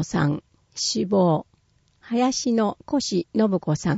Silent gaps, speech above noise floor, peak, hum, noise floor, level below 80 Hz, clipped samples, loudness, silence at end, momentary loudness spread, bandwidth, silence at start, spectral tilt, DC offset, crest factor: none; 40 dB; -8 dBFS; none; -63 dBFS; -56 dBFS; under 0.1%; -23 LUFS; 0 s; 7 LU; 8 kHz; 0 s; -5 dB/octave; under 0.1%; 14 dB